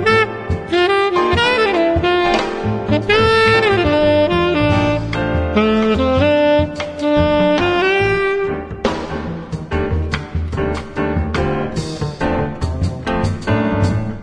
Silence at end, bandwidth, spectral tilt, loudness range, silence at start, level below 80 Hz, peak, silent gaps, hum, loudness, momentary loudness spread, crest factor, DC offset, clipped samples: 0 s; 10.5 kHz; -6.5 dB/octave; 7 LU; 0 s; -30 dBFS; -2 dBFS; none; none; -16 LUFS; 9 LU; 14 dB; under 0.1%; under 0.1%